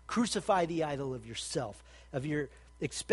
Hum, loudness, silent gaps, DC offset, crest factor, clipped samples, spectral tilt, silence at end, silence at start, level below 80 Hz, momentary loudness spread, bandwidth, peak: none; -35 LUFS; none; under 0.1%; 20 dB; under 0.1%; -4.5 dB/octave; 0 s; 0.05 s; -58 dBFS; 12 LU; 11.5 kHz; -14 dBFS